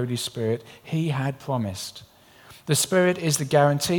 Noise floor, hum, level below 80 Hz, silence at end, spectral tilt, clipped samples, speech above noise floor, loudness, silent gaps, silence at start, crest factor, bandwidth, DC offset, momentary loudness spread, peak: -50 dBFS; none; -62 dBFS; 0 s; -4.5 dB/octave; under 0.1%; 27 dB; -24 LUFS; none; 0 s; 18 dB; 19 kHz; under 0.1%; 12 LU; -6 dBFS